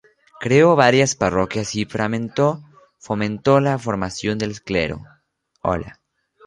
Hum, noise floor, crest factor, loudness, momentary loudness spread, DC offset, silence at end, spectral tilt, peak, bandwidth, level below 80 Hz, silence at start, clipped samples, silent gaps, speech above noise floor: none; -65 dBFS; 20 dB; -19 LUFS; 13 LU; under 0.1%; 0.55 s; -5 dB/octave; -2 dBFS; 11 kHz; -46 dBFS; 0.4 s; under 0.1%; none; 47 dB